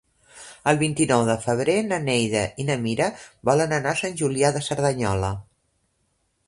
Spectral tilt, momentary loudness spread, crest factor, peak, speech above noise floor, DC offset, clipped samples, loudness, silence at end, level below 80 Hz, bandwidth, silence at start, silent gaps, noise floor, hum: -5 dB/octave; 7 LU; 20 dB; -4 dBFS; 48 dB; under 0.1%; under 0.1%; -23 LUFS; 1.05 s; -50 dBFS; 11.5 kHz; 0.35 s; none; -70 dBFS; none